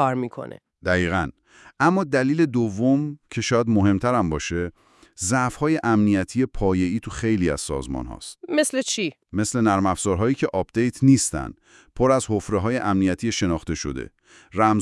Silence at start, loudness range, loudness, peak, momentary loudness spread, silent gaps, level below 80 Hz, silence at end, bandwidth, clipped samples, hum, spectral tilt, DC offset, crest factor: 0 s; 2 LU; -22 LUFS; -2 dBFS; 12 LU; none; -44 dBFS; 0 s; 12 kHz; under 0.1%; none; -5.5 dB/octave; under 0.1%; 20 dB